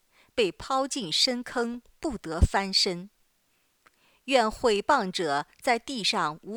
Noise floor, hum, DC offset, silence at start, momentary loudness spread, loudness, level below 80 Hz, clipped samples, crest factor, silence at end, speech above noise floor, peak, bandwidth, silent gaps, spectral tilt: -70 dBFS; none; under 0.1%; 0.35 s; 11 LU; -27 LUFS; -40 dBFS; under 0.1%; 20 dB; 0 s; 43 dB; -8 dBFS; over 20 kHz; none; -3.5 dB/octave